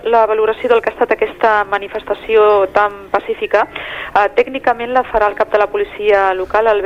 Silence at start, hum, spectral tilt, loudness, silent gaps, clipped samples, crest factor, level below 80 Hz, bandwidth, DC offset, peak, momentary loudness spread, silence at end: 0.05 s; none; -5 dB/octave; -14 LUFS; none; under 0.1%; 14 dB; -44 dBFS; 7.2 kHz; under 0.1%; 0 dBFS; 7 LU; 0 s